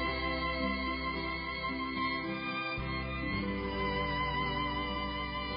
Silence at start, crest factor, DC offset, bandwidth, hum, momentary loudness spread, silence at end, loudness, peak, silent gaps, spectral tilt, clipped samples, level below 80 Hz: 0 s; 12 dB; under 0.1%; 5.2 kHz; none; 3 LU; 0 s; -34 LUFS; -22 dBFS; none; -3 dB/octave; under 0.1%; -44 dBFS